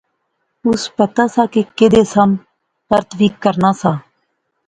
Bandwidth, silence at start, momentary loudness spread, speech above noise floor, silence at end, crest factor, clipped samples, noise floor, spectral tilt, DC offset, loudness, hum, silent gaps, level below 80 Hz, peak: 9.4 kHz; 0.65 s; 8 LU; 55 dB; 0.65 s; 16 dB; under 0.1%; -69 dBFS; -6 dB/octave; under 0.1%; -15 LUFS; none; none; -48 dBFS; 0 dBFS